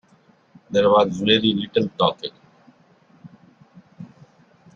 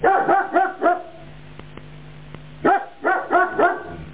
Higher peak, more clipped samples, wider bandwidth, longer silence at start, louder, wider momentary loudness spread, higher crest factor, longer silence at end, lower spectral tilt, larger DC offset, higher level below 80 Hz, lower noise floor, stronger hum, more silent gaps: about the same, -2 dBFS vs -4 dBFS; neither; first, 7.4 kHz vs 4 kHz; first, 0.7 s vs 0 s; about the same, -19 LUFS vs -20 LUFS; about the same, 25 LU vs 23 LU; first, 22 dB vs 16 dB; first, 0.7 s vs 0 s; second, -6 dB/octave vs -9 dB/octave; second, under 0.1% vs 0.6%; second, -60 dBFS vs -50 dBFS; first, -57 dBFS vs -41 dBFS; neither; neither